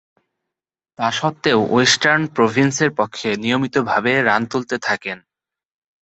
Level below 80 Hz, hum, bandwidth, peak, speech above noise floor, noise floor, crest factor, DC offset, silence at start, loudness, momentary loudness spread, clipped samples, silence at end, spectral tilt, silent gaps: -58 dBFS; none; 8.2 kHz; 0 dBFS; 67 dB; -85 dBFS; 20 dB; under 0.1%; 1 s; -17 LUFS; 8 LU; under 0.1%; 0.85 s; -4 dB/octave; none